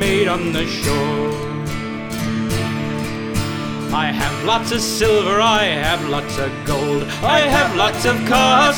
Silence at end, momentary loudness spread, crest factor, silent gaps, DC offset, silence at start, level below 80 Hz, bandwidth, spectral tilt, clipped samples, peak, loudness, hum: 0 s; 10 LU; 16 dB; none; under 0.1%; 0 s; -36 dBFS; over 20 kHz; -4 dB/octave; under 0.1%; -2 dBFS; -18 LUFS; none